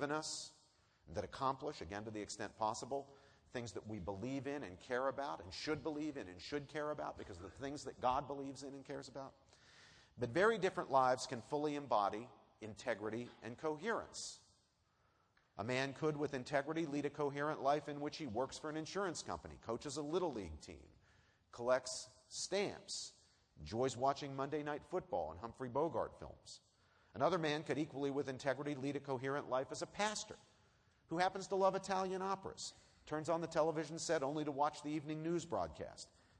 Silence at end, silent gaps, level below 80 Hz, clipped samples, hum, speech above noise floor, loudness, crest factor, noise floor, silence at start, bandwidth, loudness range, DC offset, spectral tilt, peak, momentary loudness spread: 0.35 s; none; -70 dBFS; under 0.1%; none; 36 dB; -41 LUFS; 22 dB; -77 dBFS; 0 s; 10.5 kHz; 5 LU; under 0.1%; -4.5 dB/octave; -20 dBFS; 13 LU